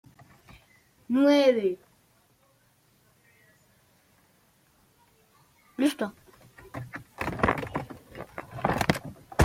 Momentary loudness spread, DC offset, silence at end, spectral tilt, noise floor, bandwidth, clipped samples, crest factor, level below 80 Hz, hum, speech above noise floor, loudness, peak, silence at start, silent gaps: 21 LU; under 0.1%; 0 s; -6 dB/octave; -65 dBFS; 16.5 kHz; under 0.1%; 26 dB; -54 dBFS; none; 42 dB; -27 LUFS; -6 dBFS; 1.1 s; none